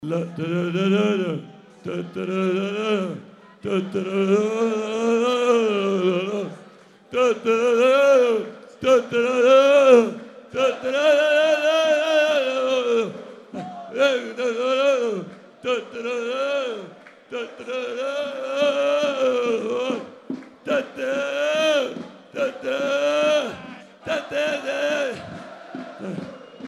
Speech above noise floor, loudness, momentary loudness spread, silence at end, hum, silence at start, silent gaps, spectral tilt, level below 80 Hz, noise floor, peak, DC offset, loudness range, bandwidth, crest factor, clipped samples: 28 dB; -21 LUFS; 18 LU; 0 s; none; 0 s; none; -5 dB/octave; -70 dBFS; -48 dBFS; -2 dBFS; under 0.1%; 8 LU; 12.5 kHz; 18 dB; under 0.1%